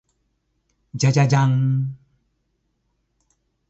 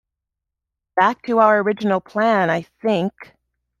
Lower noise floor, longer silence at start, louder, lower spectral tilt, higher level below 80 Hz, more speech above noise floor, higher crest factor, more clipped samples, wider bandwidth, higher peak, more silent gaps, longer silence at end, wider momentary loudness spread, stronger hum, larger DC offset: second, -71 dBFS vs -83 dBFS; about the same, 0.95 s vs 0.95 s; about the same, -19 LUFS vs -19 LUFS; about the same, -6.5 dB/octave vs -7 dB/octave; about the same, -60 dBFS vs -64 dBFS; second, 53 dB vs 65 dB; about the same, 18 dB vs 18 dB; neither; about the same, 8 kHz vs 7.4 kHz; second, -6 dBFS vs -2 dBFS; neither; first, 1.75 s vs 0.55 s; first, 12 LU vs 7 LU; neither; neither